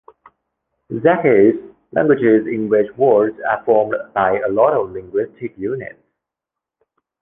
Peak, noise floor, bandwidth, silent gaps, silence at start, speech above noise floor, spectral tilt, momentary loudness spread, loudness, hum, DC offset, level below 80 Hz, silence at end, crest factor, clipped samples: 0 dBFS; -85 dBFS; 3.7 kHz; none; 0.9 s; 69 dB; -10.5 dB/octave; 13 LU; -16 LUFS; none; under 0.1%; -56 dBFS; 1.3 s; 16 dB; under 0.1%